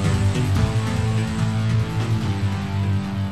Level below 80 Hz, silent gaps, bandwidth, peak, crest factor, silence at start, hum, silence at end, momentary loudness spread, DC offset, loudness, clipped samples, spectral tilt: -36 dBFS; none; 12 kHz; -6 dBFS; 14 dB; 0 s; none; 0 s; 4 LU; 0.9%; -22 LUFS; under 0.1%; -6.5 dB/octave